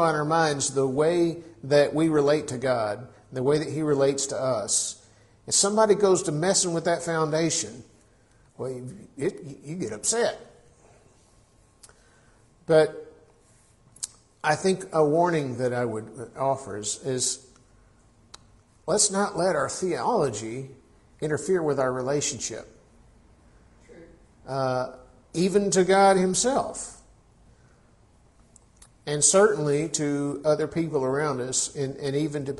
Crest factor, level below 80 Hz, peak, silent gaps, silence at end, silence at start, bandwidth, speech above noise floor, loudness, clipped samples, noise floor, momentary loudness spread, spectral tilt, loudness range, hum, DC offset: 20 dB; -60 dBFS; -6 dBFS; none; 0 s; 0 s; 11.5 kHz; 35 dB; -24 LUFS; under 0.1%; -59 dBFS; 16 LU; -4 dB/octave; 8 LU; none; under 0.1%